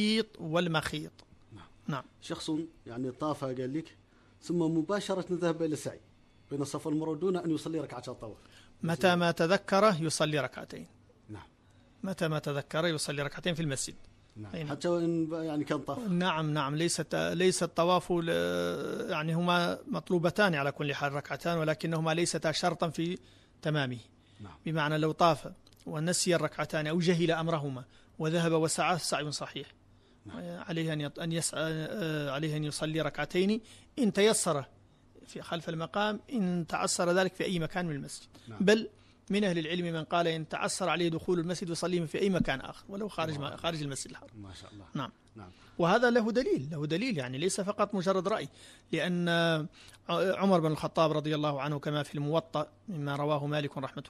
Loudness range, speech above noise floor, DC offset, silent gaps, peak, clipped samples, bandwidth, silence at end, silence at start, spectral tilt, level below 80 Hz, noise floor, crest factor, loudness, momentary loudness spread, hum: 5 LU; 30 dB; under 0.1%; none; -12 dBFS; under 0.1%; 13.5 kHz; 0 s; 0 s; -5 dB/octave; -62 dBFS; -62 dBFS; 20 dB; -31 LUFS; 15 LU; none